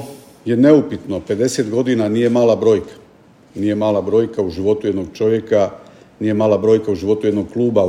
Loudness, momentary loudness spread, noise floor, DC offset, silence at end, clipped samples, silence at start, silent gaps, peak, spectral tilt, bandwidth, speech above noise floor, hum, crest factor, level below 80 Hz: -16 LUFS; 10 LU; -47 dBFS; under 0.1%; 0 s; under 0.1%; 0 s; none; 0 dBFS; -6.5 dB/octave; 15 kHz; 32 dB; none; 16 dB; -54 dBFS